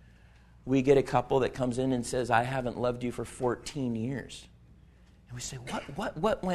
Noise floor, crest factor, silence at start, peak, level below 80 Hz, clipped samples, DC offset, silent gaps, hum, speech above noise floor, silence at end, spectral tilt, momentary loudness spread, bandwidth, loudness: -57 dBFS; 22 dB; 0.65 s; -10 dBFS; -52 dBFS; under 0.1%; under 0.1%; none; none; 27 dB; 0 s; -6 dB/octave; 14 LU; 13.5 kHz; -30 LUFS